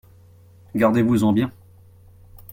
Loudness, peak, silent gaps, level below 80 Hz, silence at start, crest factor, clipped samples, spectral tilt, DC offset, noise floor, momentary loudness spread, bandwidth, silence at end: -20 LUFS; -4 dBFS; none; -54 dBFS; 0.75 s; 18 dB; under 0.1%; -7.5 dB/octave; under 0.1%; -49 dBFS; 11 LU; 16.5 kHz; 1.05 s